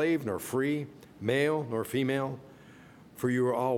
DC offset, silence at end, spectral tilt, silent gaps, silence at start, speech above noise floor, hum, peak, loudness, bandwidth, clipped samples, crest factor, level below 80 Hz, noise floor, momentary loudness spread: under 0.1%; 0 s; -6 dB/octave; none; 0 s; 23 dB; none; -14 dBFS; -31 LUFS; 18 kHz; under 0.1%; 16 dB; -70 dBFS; -53 dBFS; 10 LU